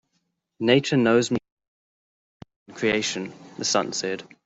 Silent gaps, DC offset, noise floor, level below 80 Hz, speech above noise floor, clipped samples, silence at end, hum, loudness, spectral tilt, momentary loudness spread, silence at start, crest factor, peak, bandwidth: 1.52-1.57 s, 1.68-2.40 s, 2.56-2.66 s; under 0.1%; -75 dBFS; -64 dBFS; 52 dB; under 0.1%; 0.2 s; none; -23 LUFS; -4 dB/octave; 11 LU; 0.6 s; 22 dB; -4 dBFS; 8.4 kHz